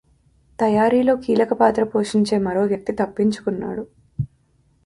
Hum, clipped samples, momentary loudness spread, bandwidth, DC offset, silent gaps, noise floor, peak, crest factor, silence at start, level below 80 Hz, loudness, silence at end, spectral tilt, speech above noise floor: none; under 0.1%; 14 LU; 11.5 kHz; under 0.1%; none; -60 dBFS; -4 dBFS; 18 dB; 0.6 s; -52 dBFS; -20 LUFS; 0.6 s; -6.5 dB/octave; 42 dB